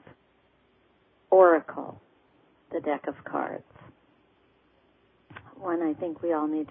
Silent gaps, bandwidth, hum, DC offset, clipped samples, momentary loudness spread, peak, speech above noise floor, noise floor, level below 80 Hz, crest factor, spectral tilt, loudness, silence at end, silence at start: none; 3.6 kHz; none; under 0.1%; under 0.1%; 22 LU; -8 dBFS; 40 dB; -65 dBFS; -72 dBFS; 22 dB; -10 dB/octave; -26 LUFS; 0.05 s; 1.3 s